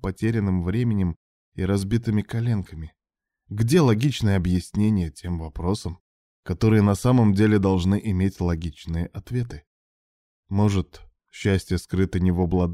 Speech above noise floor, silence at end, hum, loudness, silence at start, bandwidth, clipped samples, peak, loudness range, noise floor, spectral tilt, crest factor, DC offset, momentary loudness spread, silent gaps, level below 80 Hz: 56 dB; 0 s; none; -23 LUFS; 0.05 s; 14.5 kHz; under 0.1%; -6 dBFS; 6 LU; -77 dBFS; -7.5 dB/octave; 16 dB; under 0.1%; 14 LU; 1.16-1.52 s, 6.00-6.43 s, 9.67-10.43 s; -42 dBFS